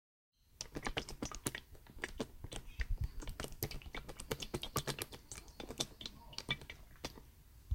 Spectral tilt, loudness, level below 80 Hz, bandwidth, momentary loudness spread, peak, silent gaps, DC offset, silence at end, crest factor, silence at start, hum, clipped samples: -3.5 dB/octave; -45 LUFS; -50 dBFS; 17 kHz; 10 LU; -16 dBFS; none; under 0.1%; 0 s; 30 dB; 0.55 s; none; under 0.1%